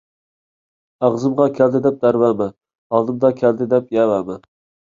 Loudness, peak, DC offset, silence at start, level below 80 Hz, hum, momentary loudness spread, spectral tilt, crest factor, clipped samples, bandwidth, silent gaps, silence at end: -17 LUFS; -2 dBFS; under 0.1%; 1 s; -60 dBFS; none; 7 LU; -8.5 dB/octave; 16 dB; under 0.1%; 7.4 kHz; 2.78-2.90 s; 0.5 s